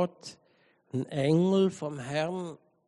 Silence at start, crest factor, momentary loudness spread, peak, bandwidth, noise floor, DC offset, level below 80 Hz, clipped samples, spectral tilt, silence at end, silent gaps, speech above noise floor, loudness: 0 s; 16 dB; 17 LU; -14 dBFS; 11 kHz; -66 dBFS; under 0.1%; -72 dBFS; under 0.1%; -7 dB/octave; 0.3 s; none; 37 dB; -29 LUFS